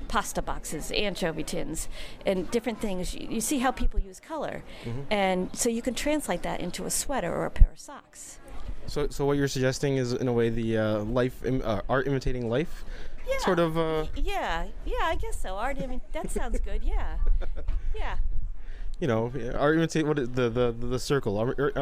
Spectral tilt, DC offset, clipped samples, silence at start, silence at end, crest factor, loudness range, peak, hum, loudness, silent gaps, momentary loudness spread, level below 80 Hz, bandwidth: -5 dB/octave; under 0.1%; under 0.1%; 0 s; 0 s; 24 dB; 5 LU; -2 dBFS; none; -29 LUFS; none; 11 LU; -32 dBFS; 15.5 kHz